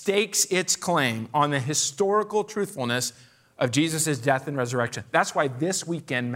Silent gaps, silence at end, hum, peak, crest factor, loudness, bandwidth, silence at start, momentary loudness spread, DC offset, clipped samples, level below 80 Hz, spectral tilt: none; 0 s; none; -6 dBFS; 20 dB; -25 LUFS; 16 kHz; 0 s; 6 LU; under 0.1%; under 0.1%; -70 dBFS; -3.5 dB/octave